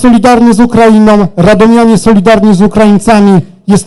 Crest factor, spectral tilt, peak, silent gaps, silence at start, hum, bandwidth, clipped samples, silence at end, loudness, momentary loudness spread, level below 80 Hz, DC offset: 4 dB; -6.5 dB/octave; 0 dBFS; none; 0 s; none; 12 kHz; 8%; 0 s; -5 LUFS; 3 LU; -28 dBFS; under 0.1%